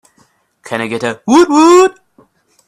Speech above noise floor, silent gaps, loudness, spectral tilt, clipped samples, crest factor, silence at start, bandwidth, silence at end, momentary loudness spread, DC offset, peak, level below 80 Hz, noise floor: 45 dB; none; -10 LUFS; -4 dB/octave; under 0.1%; 12 dB; 0.65 s; 13 kHz; 0.75 s; 13 LU; under 0.1%; 0 dBFS; -52 dBFS; -54 dBFS